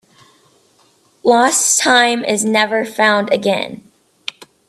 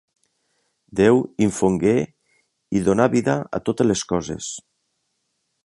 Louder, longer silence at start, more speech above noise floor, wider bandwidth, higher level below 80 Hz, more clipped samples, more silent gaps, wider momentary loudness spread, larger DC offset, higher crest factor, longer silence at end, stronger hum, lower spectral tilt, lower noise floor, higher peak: first, -13 LUFS vs -20 LUFS; first, 1.25 s vs 0.95 s; second, 41 dB vs 54 dB; first, 15 kHz vs 11.5 kHz; second, -66 dBFS vs -50 dBFS; neither; neither; first, 18 LU vs 13 LU; neither; about the same, 16 dB vs 20 dB; second, 0.9 s vs 1.05 s; neither; second, -2 dB/octave vs -6 dB/octave; second, -54 dBFS vs -73 dBFS; about the same, 0 dBFS vs -2 dBFS